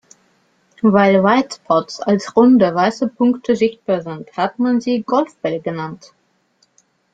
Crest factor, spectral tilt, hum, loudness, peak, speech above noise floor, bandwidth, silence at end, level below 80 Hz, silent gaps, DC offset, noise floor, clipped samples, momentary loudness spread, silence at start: 16 dB; -6.5 dB/octave; none; -16 LUFS; -2 dBFS; 45 dB; 7.8 kHz; 1.2 s; -60 dBFS; none; under 0.1%; -61 dBFS; under 0.1%; 11 LU; 0.85 s